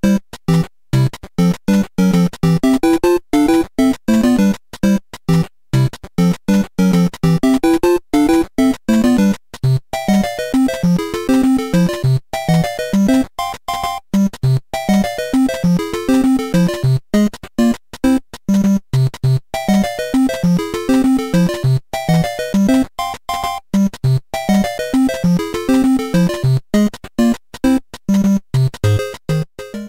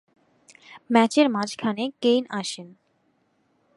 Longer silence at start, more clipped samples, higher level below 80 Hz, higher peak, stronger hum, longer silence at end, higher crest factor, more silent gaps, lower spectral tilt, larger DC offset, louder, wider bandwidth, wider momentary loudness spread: second, 0.05 s vs 0.7 s; neither; first, -36 dBFS vs -76 dBFS; about the same, -2 dBFS vs -4 dBFS; neither; second, 0 s vs 1.1 s; second, 14 dB vs 22 dB; neither; first, -7 dB/octave vs -4.5 dB/octave; first, 0.4% vs under 0.1%; first, -16 LUFS vs -23 LUFS; first, 16.5 kHz vs 11.5 kHz; second, 5 LU vs 11 LU